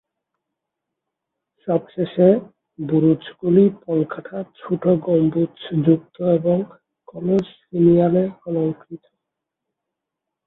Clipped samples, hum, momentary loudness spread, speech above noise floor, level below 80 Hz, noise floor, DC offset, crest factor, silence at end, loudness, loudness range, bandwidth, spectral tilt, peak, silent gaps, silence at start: under 0.1%; none; 14 LU; 64 dB; -60 dBFS; -83 dBFS; under 0.1%; 18 dB; 1.5 s; -19 LUFS; 2 LU; 4.1 kHz; -11 dB/octave; -2 dBFS; none; 1.65 s